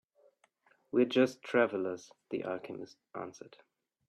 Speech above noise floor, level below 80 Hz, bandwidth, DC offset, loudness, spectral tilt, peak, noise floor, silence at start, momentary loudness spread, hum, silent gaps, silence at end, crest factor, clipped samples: 37 dB; -80 dBFS; 10 kHz; under 0.1%; -33 LUFS; -5.5 dB/octave; -14 dBFS; -70 dBFS; 0.95 s; 17 LU; none; none; 0.6 s; 20 dB; under 0.1%